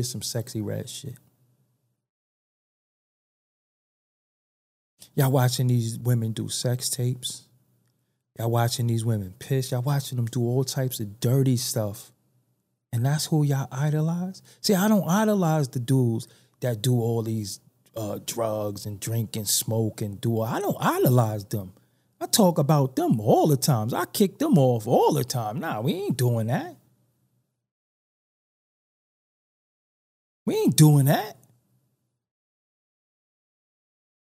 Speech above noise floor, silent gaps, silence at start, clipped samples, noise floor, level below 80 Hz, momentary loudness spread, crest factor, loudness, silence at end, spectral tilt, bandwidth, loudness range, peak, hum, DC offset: 51 dB; 2.09-4.98 s, 27.71-30.46 s; 0 s; under 0.1%; -74 dBFS; -70 dBFS; 13 LU; 22 dB; -24 LUFS; 3.05 s; -5.5 dB/octave; 16 kHz; 8 LU; -4 dBFS; none; under 0.1%